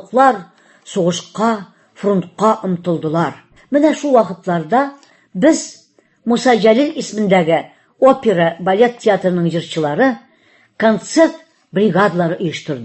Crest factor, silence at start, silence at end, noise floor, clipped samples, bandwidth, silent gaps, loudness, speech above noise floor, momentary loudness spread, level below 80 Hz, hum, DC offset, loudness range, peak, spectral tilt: 16 dB; 0 s; 0 s; -53 dBFS; under 0.1%; 8.6 kHz; none; -15 LUFS; 38 dB; 9 LU; -60 dBFS; none; under 0.1%; 3 LU; 0 dBFS; -5.5 dB/octave